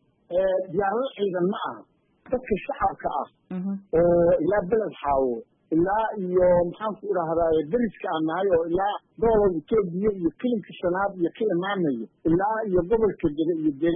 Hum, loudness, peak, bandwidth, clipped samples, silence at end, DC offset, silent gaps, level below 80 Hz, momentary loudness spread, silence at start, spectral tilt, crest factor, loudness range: none; -25 LUFS; -10 dBFS; 3.7 kHz; under 0.1%; 0 s; under 0.1%; none; -48 dBFS; 9 LU; 0.3 s; -11.5 dB/octave; 14 dB; 4 LU